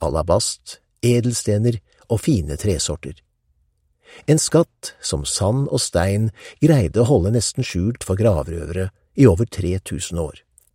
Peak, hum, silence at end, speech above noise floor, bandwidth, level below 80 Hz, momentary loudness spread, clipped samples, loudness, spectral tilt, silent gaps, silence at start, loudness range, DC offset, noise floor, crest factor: 0 dBFS; none; 0.45 s; 46 dB; 16 kHz; -38 dBFS; 12 LU; under 0.1%; -20 LUFS; -5.5 dB/octave; none; 0 s; 3 LU; under 0.1%; -65 dBFS; 20 dB